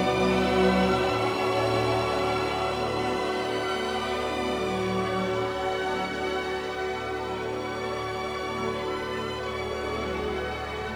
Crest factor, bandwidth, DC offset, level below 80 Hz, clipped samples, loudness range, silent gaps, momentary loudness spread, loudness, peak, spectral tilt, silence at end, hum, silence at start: 16 dB; over 20 kHz; under 0.1%; -46 dBFS; under 0.1%; 5 LU; none; 8 LU; -28 LUFS; -10 dBFS; -5 dB/octave; 0 s; none; 0 s